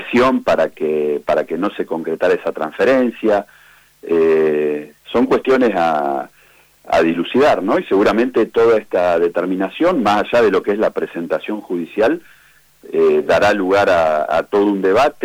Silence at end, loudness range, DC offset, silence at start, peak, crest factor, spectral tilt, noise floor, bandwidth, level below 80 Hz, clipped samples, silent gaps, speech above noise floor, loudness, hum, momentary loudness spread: 0 s; 3 LU; under 0.1%; 0 s; -8 dBFS; 8 dB; -6 dB/octave; -50 dBFS; 16 kHz; -50 dBFS; under 0.1%; none; 35 dB; -16 LUFS; none; 8 LU